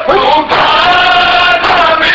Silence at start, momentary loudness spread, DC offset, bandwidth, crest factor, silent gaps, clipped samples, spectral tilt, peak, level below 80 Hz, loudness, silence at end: 0 s; 2 LU; under 0.1%; 8 kHz; 8 dB; none; under 0.1%; -3.5 dB/octave; 0 dBFS; -34 dBFS; -7 LUFS; 0 s